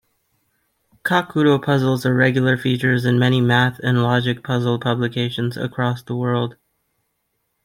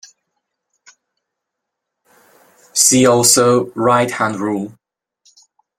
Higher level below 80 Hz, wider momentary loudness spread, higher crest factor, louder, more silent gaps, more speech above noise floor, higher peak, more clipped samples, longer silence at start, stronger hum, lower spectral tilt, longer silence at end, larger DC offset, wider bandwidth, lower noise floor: about the same, -58 dBFS vs -58 dBFS; second, 7 LU vs 12 LU; about the same, 18 dB vs 18 dB; second, -19 LUFS vs -13 LUFS; neither; second, 54 dB vs 65 dB; about the same, -2 dBFS vs 0 dBFS; neither; second, 1.05 s vs 2.75 s; neither; first, -7 dB/octave vs -3 dB/octave; about the same, 1.1 s vs 1.1 s; neither; about the same, 16 kHz vs 16.5 kHz; second, -72 dBFS vs -79 dBFS